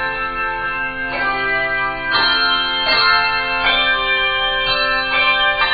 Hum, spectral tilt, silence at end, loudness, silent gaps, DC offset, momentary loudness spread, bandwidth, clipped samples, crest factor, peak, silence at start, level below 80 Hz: none; 2 dB/octave; 0 s; -15 LUFS; none; under 0.1%; 7 LU; 5 kHz; under 0.1%; 16 dB; -2 dBFS; 0 s; -38 dBFS